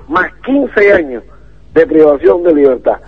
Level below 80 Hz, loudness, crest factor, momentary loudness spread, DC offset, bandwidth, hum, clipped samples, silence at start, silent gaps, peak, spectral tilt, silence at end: -40 dBFS; -10 LUFS; 10 dB; 7 LU; 1%; 6.4 kHz; none; 0.9%; 0.1 s; none; 0 dBFS; -7.5 dB/octave; 0.1 s